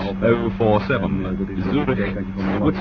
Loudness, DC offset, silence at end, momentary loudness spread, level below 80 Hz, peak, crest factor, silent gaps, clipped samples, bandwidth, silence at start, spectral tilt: -21 LUFS; under 0.1%; 0 s; 6 LU; -36 dBFS; -2 dBFS; 18 dB; none; under 0.1%; 6.2 kHz; 0 s; -9.5 dB/octave